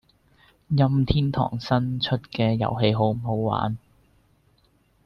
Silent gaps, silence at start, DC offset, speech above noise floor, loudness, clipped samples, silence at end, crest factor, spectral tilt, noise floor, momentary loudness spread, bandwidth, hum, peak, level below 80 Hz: none; 0.7 s; under 0.1%; 40 dB; -24 LUFS; under 0.1%; 1.3 s; 20 dB; -8.5 dB/octave; -63 dBFS; 6 LU; 6.2 kHz; none; -6 dBFS; -44 dBFS